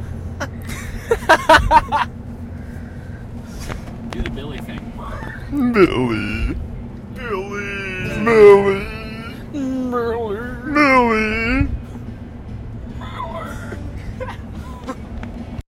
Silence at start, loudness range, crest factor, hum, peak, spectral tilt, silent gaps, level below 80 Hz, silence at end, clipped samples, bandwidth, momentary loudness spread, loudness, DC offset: 0 s; 14 LU; 20 dB; none; 0 dBFS; -6 dB/octave; none; -32 dBFS; 0.05 s; under 0.1%; 15.5 kHz; 20 LU; -17 LUFS; under 0.1%